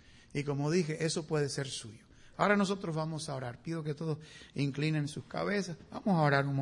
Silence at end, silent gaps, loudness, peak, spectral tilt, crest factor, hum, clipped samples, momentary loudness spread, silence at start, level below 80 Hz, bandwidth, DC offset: 0 s; none; -34 LUFS; -14 dBFS; -5.5 dB/octave; 20 dB; none; under 0.1%; 13 LU; 0.35 s; -66 dBFS; 11 kHz; under 0.1%